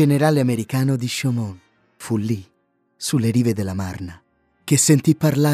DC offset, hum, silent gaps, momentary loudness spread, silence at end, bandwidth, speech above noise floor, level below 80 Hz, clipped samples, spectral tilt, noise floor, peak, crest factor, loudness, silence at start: under 0.1%; none; none; 15 LU; 0 s; 15.5 kHz; 47 dB; -56 dBFS; under 0.1%; -5.5 dB/octave; -66 dBFS; -4 dBFS; 16 dB; -20 LUFS; 0 s